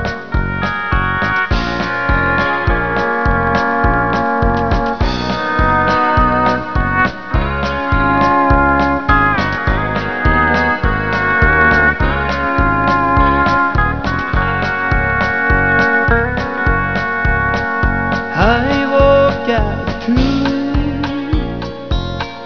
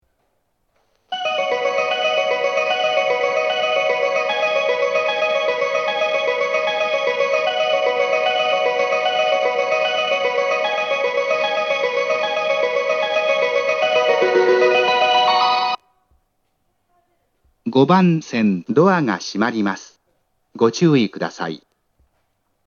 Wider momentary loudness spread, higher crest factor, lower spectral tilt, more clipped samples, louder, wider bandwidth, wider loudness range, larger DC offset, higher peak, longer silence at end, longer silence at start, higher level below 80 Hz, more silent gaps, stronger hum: about the same, 6 LU vs 6 LU; about the same, 14 dB vs 18 dB; first, -7 dB/octave vs -5 dB/octave; neither; first, -14 LUFS vs -18 LUFS; second, 5.4 kHz vs 7.2 kHz; about the same, 2 LU vs 3 LU; first, 2% vs under 0.1%; about the same, 0 dBFS vs 0 dBFS; second, 0 s vs 1.1 s; second, 0 s vs 1.1 s; first, -22 dBFS vs -72 dBFS; neither; neither